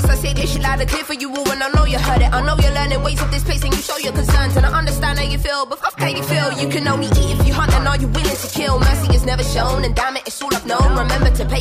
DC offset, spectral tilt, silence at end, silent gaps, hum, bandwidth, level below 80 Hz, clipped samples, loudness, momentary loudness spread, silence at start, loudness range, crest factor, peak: under 0.1%; -5 dB/octave; 0 s; none; none; 15.5 kHz; -20 dBFS; under 0.1%; -17 LUFS; 5 LU; 0 s; 1 LU; 14 dB; -2 dBFS